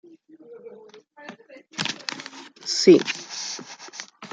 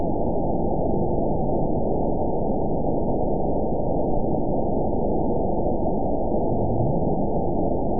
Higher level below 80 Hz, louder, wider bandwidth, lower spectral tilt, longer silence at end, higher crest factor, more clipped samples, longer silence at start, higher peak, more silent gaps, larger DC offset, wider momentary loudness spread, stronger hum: second, -76 dBFS vs -32 dBFS; about the same, -22 LUFS vs -24 LUFS; first, 9.2 kHz vs 1 kHz; second, -3.5 dB/octave vs -18.5 dB/octave; about the same, 0.05 s vs 0 s; first, 24 dB vs 12 dB; neither; first, 0.5 s vs 0 s; first, -2 dBFS vs -10 dBFS; neither; second, under 0.1% vs 5%; first, 28 LU vs 1 LU; neither